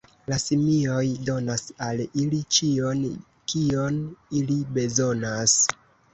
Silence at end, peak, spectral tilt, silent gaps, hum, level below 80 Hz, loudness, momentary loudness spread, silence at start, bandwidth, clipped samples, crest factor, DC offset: 0.4 s; -4 dBFS; -4 dB/octave; none; none; -56 dBFS; -24 LUFS; 10 LU; 0.3 s; 8.4 kHz; under 0.1%; 20 dB; under 0.1%